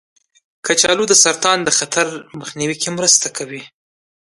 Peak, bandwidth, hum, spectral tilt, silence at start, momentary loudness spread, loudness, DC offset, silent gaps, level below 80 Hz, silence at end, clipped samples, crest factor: 0 dBFS; 12 kHz; none; -1 dB/octave; 0.65 s; 18 LU; -14 LUFS; under 0.1%; none; -60 dBFS; 0.65 s; under 0.1%; 18 dB